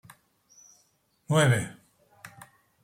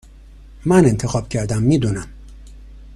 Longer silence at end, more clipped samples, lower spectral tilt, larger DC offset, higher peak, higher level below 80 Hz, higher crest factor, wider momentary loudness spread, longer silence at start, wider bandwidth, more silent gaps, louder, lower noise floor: first, 0.55 s vs 0 s; neither; second, -5 dB/octave vs -7 dB/octave; neither; second, -10 dBFS vs 0 dBFS; second, -66 dBFS vs -38 dBFS; about the same, 20 dB vs 18 dB; first, 27 LU vs 14 LU; first, 1.3 s vs 0.35 s; first, 16 kHz vs 12.5 kHz; neither; second, -25 LUFS vs -18 LUFS; first, -69 dBFS vs -41 dBFS